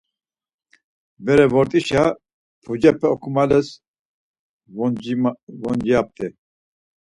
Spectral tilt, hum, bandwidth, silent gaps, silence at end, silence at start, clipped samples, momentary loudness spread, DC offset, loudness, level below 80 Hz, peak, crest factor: -7 dB/octave; none; 11.5 kHz; 2.34-2.62 s, 3.87-4.60 s, 5.43-5.47 s; 0.9 s; 1.2 s; under 0.1%; 15 LU; under 0.1%; -19 LUFS; -52 dBFS; 0 dBFS; 20 dB